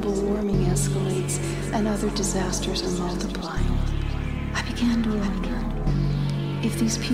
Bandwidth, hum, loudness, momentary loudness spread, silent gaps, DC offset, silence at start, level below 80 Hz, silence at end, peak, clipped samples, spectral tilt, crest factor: 15.5 kHz; none; -25 LUFS; 5 LU; none; 0.2%; 0 s; -30 dBFS; 0 s; -10 dBFS; under 0.1%; -5.5 dB/octave; 14 dB